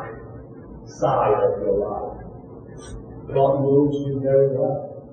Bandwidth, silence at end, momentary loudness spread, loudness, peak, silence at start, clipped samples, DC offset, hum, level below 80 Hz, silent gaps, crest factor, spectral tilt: 8.8 kHz; 0 s; 22 LU; -21 LUFS; -6 dBFS; 0 s; under 0.1%; under 0.1%; none; -46 dBFS; none; 16 dB; -8.5 dB/octave